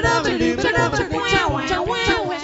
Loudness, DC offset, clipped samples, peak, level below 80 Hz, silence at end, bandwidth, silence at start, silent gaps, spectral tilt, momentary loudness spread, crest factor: -19 LUFS; under 0.1%; under 0.1%; -4 dBFS; -36 dBFS; 0 s; 8 kHz; 0 s; none; -4.5 dB/octave; 3 LU; 16 dB